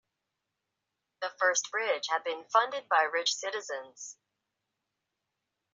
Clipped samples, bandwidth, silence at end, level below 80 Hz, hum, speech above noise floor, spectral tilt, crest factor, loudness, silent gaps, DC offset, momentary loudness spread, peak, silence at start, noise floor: under 0.1%; 8 kHz; 1.6 s; under -90 dBFS; none; 55 dB; 4 dB/octave; 22 dB; -30 LUFS; none; under 0.1%; 13 LU; -12 dBFS; 1.2 s; -85 dBFS